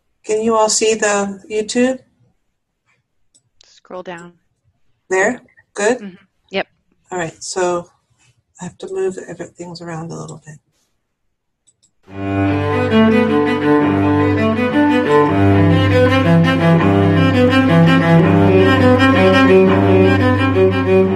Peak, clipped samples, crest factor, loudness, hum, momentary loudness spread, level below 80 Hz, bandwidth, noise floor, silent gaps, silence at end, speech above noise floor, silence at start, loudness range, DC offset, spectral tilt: 0 dBFS; under 0.1%; 14 dB; -13 LUFS; none; 19 LU; -48 dBFS; 12 kHz; -71 dBFS; none; 0 s; 58 dB; 0.25 s; 17 LU; under 0.1%; -6 dB/octave